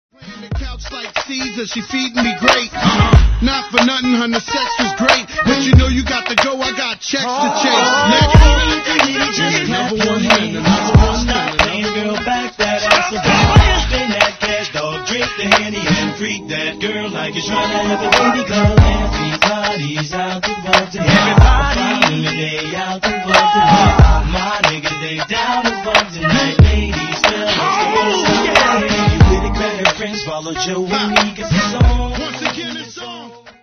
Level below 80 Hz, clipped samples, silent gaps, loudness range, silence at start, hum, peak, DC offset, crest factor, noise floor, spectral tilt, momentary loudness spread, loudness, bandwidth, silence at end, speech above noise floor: -20 dBFS; under 0.1%; none; 4 LU; 0.2 s; none; 0 dBFS; under 0.1%; 14 dB; -35 dBFS; -4.5 dB/octave; 10 LU; -14 LUFS; 9.6 kHz; 0.1 s; 21 dB